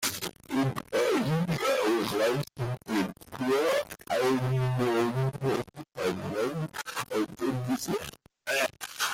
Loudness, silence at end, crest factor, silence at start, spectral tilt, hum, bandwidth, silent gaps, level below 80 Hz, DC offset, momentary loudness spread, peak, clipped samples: -29 LUFS; 0 s; 12 dB; 0 s; -5 dB/octave; none; 16.5 kHz; none; -60 dBFS; under 0.1%; 8 LU; -16 dBFS; under 0.1%